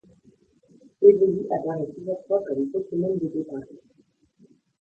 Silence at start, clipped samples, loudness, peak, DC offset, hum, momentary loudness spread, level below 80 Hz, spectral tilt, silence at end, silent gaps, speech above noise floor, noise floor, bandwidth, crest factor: 1 s; under 0.1%; -24 LUFS; -4 dBFS; under 0.1%; none; 15 LU; -68 dBFS; -11 dB/octave; 1.05 s; none; 39 dB; -62 dBFS; 2.4 kHz; 22 dB